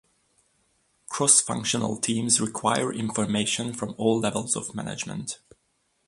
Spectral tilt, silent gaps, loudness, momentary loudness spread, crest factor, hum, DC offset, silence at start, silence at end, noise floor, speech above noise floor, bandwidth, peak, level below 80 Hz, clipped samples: -3 dB/octave; none; -24 LUFS; 14 LU; 22 dB; none; under 0.1%; 1.1 s; 0.7 s; -71 dBFS; 46 dB; 11.5 kHz; -4 dBFS; -62 dBFS; under 0.1%